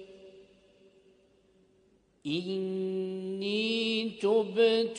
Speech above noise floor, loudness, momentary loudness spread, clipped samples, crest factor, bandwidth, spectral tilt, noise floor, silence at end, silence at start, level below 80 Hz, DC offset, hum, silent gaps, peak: 38 dB; -30 LUFS; 10 LU; under 0.1%; 18 dB; 10 kHz; -5 dB/octave; -67 dBFS; 0 s; 0 s; -76 dBFS; under 0.1%; none; none; -14 dBFS